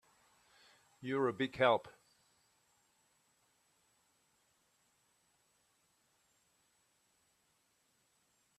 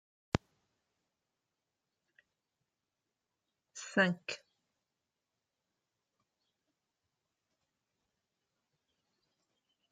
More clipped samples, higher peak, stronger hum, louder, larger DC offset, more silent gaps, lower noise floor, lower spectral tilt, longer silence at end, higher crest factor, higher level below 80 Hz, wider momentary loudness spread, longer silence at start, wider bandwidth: neither; second, -16 dBFS vs -10 dBFS; neither; about the same, -35 LUFS vs -35 LUFS; neither; neither; second, -77 dBFS vs -89 dBFS; about the same, -5.5 dB/octave vs -5 dB/octave; first, 6.7 s vs 5.55 s; second, 28 dB vs 36 dB; second, -82 dBFS vs -66 dBFS; second, 9 LU vs 17 LU; first, 1 s vs 0.35 s; first, 13.5 kHz vs 9.4 kHz